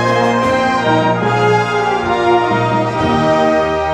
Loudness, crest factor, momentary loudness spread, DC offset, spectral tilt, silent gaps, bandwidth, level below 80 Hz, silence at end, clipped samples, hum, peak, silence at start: -14 LUFS; 12 dB; 2 LU; under 0.1%; -6 dB/octave; none; 11.5 kHz; -40 dBFS; 0 s; under 0.1%; none; -2 dBFS; 0 s